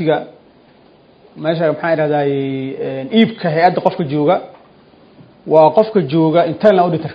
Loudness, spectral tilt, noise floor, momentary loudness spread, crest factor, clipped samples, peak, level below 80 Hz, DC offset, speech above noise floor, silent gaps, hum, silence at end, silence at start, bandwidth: -15 LUFS; -9 dB/octave; -47 dBFS; 11 LU; 16 dB; under 0.1%; 0 dBFS; -60 dBFS; under 0.1%; 33 dB; none; none; 0 s; 0 s; 5.2 kHz